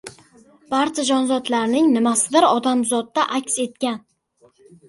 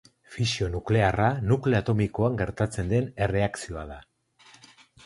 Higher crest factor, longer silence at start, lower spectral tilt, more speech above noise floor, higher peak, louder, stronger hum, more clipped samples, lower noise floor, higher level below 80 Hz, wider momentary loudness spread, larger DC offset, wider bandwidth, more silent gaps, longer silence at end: about the same, 18 dB vs 20 dB; second, 0.05 s vs 0.3 s; second, -2.5 dB/octave vs -6.5 dB/octave; first, 39 dB vs 31 dB; first, -4 dBFS vs -8 dBFS; first, -19 LUFS vs -26 LUFS; neither; neither; about the same, -58 dBFS vs -56 dBFS; second, -66 dBFS vs -44 dBFS; second, 9 LU vs 13 LU; neither; about the same, 11.5 kHz vs 11.5 kHz; neither; second, 0.9 s vs 1.05 s